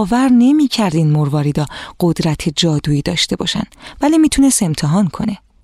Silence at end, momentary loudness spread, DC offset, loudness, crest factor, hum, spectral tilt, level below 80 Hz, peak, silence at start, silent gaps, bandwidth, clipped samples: 0.25 s; 10 LU; under 0.1%; -15 LUFS; 12 dB; none; -5 dB/octave; -38 dBFS; -2 dBFS; 0 s; none; 14 kHz; under 0.1%